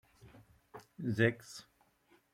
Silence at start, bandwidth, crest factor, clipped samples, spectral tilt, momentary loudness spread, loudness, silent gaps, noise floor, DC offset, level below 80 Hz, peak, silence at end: 0.25 s; 15.5 kHz; 24 dB; under 0.1%; -6.5 dB/octave; 24 LU; -34 LUFS; none; -70 dBFS; under 0.1%; -74 dBFS; -14 dBFS; 0.7 s